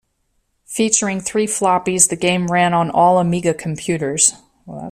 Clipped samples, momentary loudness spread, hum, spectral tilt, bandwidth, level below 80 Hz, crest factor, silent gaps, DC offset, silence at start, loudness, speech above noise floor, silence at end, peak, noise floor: under 0.1%; 9 LU; none; -3.5 dB/octave; 15.5 kHz; -54 dBFS; 18 dB; none; under 0.1%; 0.7 s; -16 LUFS; 50 dB; 0 s; 0 dBFS; -67 dBFS